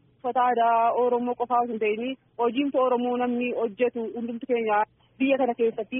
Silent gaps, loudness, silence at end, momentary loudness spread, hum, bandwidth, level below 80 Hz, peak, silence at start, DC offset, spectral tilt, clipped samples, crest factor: none; -25 LUFS; 0 s; 8 LU; none; 3.7 kHz; -72 dBFS; -12 dBFS; 0.25 s; under 0.1%; 0.5 dB/octave; under 0.1%; 14 dB